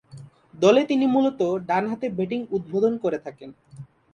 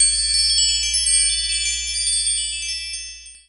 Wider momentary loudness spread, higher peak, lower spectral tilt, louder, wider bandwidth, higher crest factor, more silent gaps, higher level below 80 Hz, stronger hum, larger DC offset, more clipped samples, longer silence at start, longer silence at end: about the same, 10 LU vs 11 LU; about the same, -4 dBFS vs -6 dBFS; first, -6.5 dB/octave vs 3.5 dB/octave; second, -23 LUFS vs -17 LUFS; second, 9.6 kHz vs 11.5 kHz; about the same, 20 dB vs 16 dB; neither; second, -64 dBFS vs -40 dBFS; neither; second, under 0.1% vs 0.4%; neither; first, 0.15 s vs 0 s; first, 0.3 s vs 0.1 s